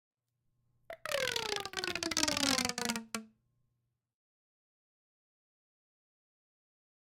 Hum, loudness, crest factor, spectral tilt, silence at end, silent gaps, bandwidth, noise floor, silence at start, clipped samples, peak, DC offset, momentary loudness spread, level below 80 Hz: none; -34 LUFS; 30 dB; -1.5 dB/octave; 3.85 s; none; 17 kHz; -83 dBFS; 0.9 s; under 0.1%; -10 dBFS; under 0.1%; 14 LU; -68 dBFS